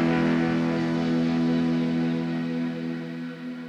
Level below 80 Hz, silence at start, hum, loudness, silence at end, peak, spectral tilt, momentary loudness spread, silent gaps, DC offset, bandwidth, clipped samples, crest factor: -56 dBFS; 0 s; none; -26 LUFS; 0 s; -12 dBFS; -7.5 dB/octave; 10 LU; none; under 0.1%; 7.8 kHz; under 0.1%; 14 dB